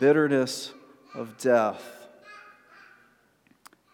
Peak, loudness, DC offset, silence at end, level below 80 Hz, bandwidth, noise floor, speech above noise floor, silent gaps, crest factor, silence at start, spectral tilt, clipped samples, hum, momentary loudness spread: -8 dBFS; -25 LUFS; under 0.1%; 1.55 s; -84 dBFS; 17.5 kHz; -64 dBFS; 40 dB; none; 20 dB; 0 s; -5 dB/octave; under 0.1%; none; 25 LU